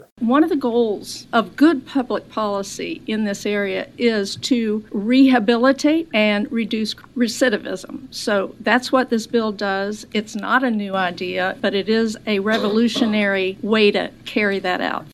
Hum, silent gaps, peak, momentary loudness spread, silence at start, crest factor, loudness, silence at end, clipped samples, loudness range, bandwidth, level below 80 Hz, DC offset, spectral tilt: none; none; 0 dBFS; 8 LU; 0.2 s; 20 dB; -19 LUFS; 0.05 s; under 0.1%; 3 LU; 13.5 kHz; -56 dBFS; under 0.1%; -4.5 dB/octave